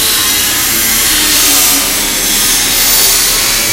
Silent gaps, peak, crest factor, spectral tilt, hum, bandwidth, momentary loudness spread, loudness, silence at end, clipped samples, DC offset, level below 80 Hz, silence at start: none; 0 dBFS; 10 dB; 0.5 dB/octave; none; over 20 kHz; 3 LU; -7 LUFS; 0 s; 0.3%; under 0.1%; -30 dBFS; 0 s